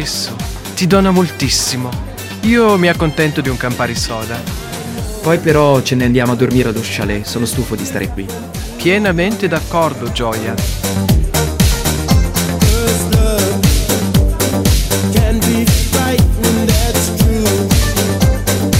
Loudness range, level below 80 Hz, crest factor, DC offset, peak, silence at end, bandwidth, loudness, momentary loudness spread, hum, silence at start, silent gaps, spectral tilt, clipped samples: 3 LU; -20 dBFS; 14 dB; under 0.1%; 0 dBFS; 0 s; 16.5 kHz; -14 LUFS; 9 LU; none; 0 s; none; -5 dB/octave; under 0.1%